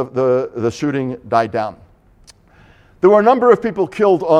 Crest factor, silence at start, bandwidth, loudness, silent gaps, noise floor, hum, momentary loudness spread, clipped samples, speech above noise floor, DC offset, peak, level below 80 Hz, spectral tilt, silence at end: 16 dB; 0 s; 10 kHz; -15 LUFS; none; -48 dBFS; none; 10 LU; under 0.1%; 33 dB; under 0.1%; 0 dBFS; -54 dBFS; -7 dB/octave; 0 s